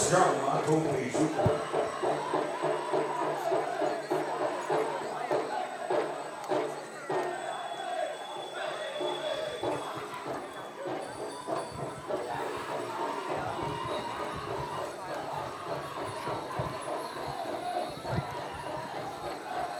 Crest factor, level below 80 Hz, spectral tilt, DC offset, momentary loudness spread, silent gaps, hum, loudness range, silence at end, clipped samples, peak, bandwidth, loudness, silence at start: 22 dB; -62 dBFS; -4.5 dB/octave; under 0.1%; 9 LU; none; none; 6 LU; 0 s; under 0.1%; -10 dBFS; 19.5 kHz; -33 LUFS; 0 s